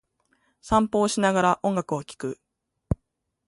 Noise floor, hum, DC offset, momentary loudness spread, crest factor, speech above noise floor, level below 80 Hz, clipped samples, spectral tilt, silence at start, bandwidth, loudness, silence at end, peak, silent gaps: -77 dBFS; none; under 0.1%; 13 LU; 20 dB; 54 dB; -46 dBFS; under 0.1%; -5 dB/octave; 0.65 s; 11.5 kHz; -25 LUFS; 0.55 s; -8 dBFS; none